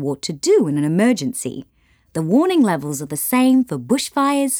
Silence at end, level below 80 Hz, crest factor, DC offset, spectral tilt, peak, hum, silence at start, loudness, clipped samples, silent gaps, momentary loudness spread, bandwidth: 0 s; -60 dBFS; 12 dB; under 0.1%; -5 dB/octave; -6 dBFS; none; 0 s; -18 LUFS; under 0.1%; none; 11 LU; over 20 kHz